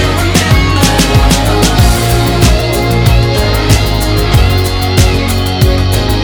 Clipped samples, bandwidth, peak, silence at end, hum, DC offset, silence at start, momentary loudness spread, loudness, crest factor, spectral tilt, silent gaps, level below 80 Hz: 0.6%; over 20 kHz; 0 dBFS; 0 s; none; under 0.1%; 0 s; 3 LU; -10 LUFS; 8 dB; -5 dB/octave; none; -14 dBFS